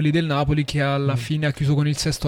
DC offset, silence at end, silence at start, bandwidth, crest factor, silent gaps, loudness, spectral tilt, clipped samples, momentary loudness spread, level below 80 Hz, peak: under 0.1%; 0 s; 0 s; 15 kHz; 12 dB; none; -21 LUFS; -6 dB/octave; under 0.1%; 2 LU; -42 dBFS; -8 dBFS